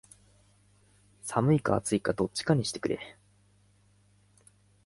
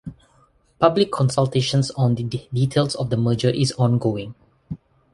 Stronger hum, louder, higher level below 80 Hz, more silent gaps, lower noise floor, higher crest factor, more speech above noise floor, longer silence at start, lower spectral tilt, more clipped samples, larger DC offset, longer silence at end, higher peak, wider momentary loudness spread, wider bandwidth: first, 50 Hz at -55 dBFS vs none; second, -29 LUFS vs -21 LUFS; second, -60 dBFS vs -52 dBFS; neither; first, -64 dBFS vs -58 dBFS; about the same, 22 dB vs 20 dB; about the same, 36 dB vs 39 dB; first, 1.25 s vs 0.05 s; about the same, -5.5 dB/octave vs -6.5 dB/octave; neither; neither; first, 1.75 s vs 0.4 s; second, -10 dBFS vs -2 dBFS; second, 11 LU vs 18 LU; about the same, 11.5 kHz vs 11.5 kHz